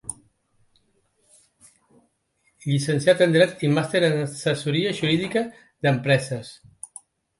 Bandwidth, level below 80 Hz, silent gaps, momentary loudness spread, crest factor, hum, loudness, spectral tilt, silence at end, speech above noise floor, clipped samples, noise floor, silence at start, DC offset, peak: 11.5 kHz; -64 dBFS; none; 19 LU; 22 dB; none; -22 LUFS; -5.5 dB/octave; 0.85 s; 47 dB; under 0.1%; -69 dBFS; 0.05 s; under 0.1%; -2 dBFS